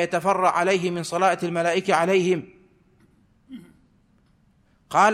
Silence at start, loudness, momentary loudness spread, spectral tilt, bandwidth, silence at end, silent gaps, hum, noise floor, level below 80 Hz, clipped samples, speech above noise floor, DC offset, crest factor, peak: 0 s; -22 LUFS; 11 LU; -5 dB/octave; 14.5 kHz; 0 s; none; none; -61 dBFS; -66 dBFS; under 0.1%; 39 dB; under 0.1%; 18 dB; -6 dBFS